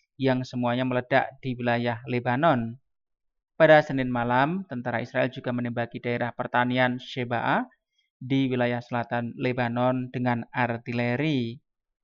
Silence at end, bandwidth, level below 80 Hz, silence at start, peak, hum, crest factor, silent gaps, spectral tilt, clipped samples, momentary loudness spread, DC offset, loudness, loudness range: 0.45 s; 7.2 kHz; -62 dBFS; 0.2 s; -6 dBFS; none; 20 dB; 8.10-8.20 s; -8 dB/octave; under 0.1%; 8 LU; under 0.1%; -26 LUFS; 3 LU